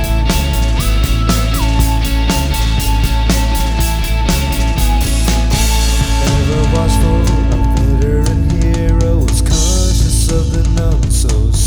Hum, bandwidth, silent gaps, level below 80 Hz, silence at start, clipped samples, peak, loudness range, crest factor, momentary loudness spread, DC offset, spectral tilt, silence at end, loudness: none; over 20 kHz; none; -14 dBFS; 0 s; under 0.1%; 0 dBFS; 1 LU; 12 dB; 2 LU; under 0.1%; -5 dB/octave; 0 s; -14 LUFS